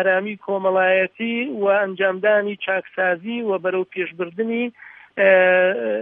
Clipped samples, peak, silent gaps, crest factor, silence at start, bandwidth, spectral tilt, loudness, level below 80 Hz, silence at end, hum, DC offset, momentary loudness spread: under 0.1%; -4 dBFS; none; 16 dB; 0 s; 3.8 kHz; -8.5 dB/octave; -20 LUFS; -78 dBFS; 0 s; none; under 0.1%; 10 LU